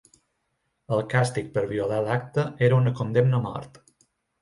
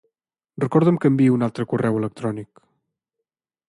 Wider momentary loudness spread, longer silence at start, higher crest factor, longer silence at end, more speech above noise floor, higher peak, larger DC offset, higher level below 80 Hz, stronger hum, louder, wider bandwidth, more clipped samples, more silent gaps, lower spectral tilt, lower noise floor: second, 7 LU vs 11 LU; first, 0.9 s vs 0.6 s; about the same, 18 dB vs 18 dB; second, 0.75 s vs 1.25 s; second, 52 dB vs 64 dB; second, -8 dBFS vs -4 dBFS; neither; about the same, -58 dBFS vs -62 dBFS; neither; second, -25 LUFS vs -20 LUFS; about the same, 11.5 kHz vs 11.5 kHz; neither; neither; second, -7 dB/octave vs -9 dB/octave; second, -76 dBFS vs -84 dBFS